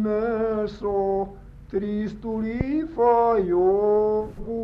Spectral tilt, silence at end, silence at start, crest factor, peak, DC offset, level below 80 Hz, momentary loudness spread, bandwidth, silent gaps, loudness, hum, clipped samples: -9.5 dB/octave; 0 s; 0 s; 14 dB; -8 dBFS; under 0.1%; -44 dBFS; 9 LU; 6 kHz; none; -23 LUFS; none; under 0.1%